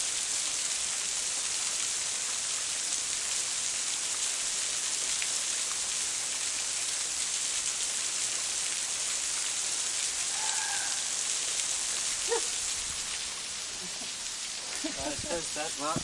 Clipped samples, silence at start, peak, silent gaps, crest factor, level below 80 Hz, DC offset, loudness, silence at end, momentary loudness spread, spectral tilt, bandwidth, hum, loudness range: under 0.1%; 0 s; -12 dBFS; none; 20 dB; -62 dBFS; under 0.1%; -29 LUFS; 0 s; 5 LU; 1 dB/octave; 11.5 kHz; none; 2 LU